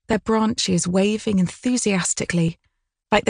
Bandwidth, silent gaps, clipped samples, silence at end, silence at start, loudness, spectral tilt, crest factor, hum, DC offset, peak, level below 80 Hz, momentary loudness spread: 10.5 kHz; none; under 0.1%; 0 s; 0.1 s; -21 LUFS; -4.5 dB/octave; 20 dB; none; under 0.1%; 0 dBFS; -50 dBFS; 2 LU